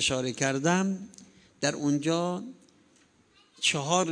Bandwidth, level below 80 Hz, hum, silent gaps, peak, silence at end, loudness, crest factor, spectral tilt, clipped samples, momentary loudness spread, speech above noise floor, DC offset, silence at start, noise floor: 10 kHz; -64 dBFS; none; none; -10 dBFS; 0 s; -28 LUFS; 20 dB; -3.5 dB/octave; under 0.1%; 12 LU; 35 dB; under 0.1%; 0 s; -63 dBFS